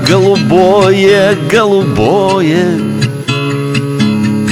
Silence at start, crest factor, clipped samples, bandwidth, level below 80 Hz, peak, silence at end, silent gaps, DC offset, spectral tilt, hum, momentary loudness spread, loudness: 0 s; 10 dB; 0.2%; 15.5 kHz; -40 dBFS; 0 dBFS; 0 s; none; under 0.1%; -6 dB/octave; none; 7 LU; -10 LUFS